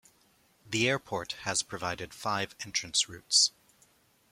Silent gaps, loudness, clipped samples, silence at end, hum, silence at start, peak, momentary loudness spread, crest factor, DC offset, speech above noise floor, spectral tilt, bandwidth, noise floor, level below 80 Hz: none; -29 LUFS; under 0.1%; 0.8 s; none; 0.65 s; -10 dBFS; 12 LU; 22 dB; under 0.1%; 35 dB; -1.5 dB/octave; 16.5 kHz; -66 dBFS; -66 dBFS